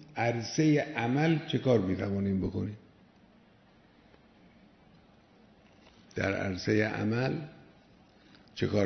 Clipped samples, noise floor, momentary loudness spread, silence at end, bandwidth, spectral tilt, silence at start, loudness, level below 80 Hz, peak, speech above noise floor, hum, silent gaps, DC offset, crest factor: under 0.1%; -61 dBFS; 13 LU; 0 s; 6.4 kHz; -6.5 dB/octave; 0 s; -30 LUFS; -62 dBFS; -12 dBFS; 32 dB; none; none; under 0.1%; 20 dB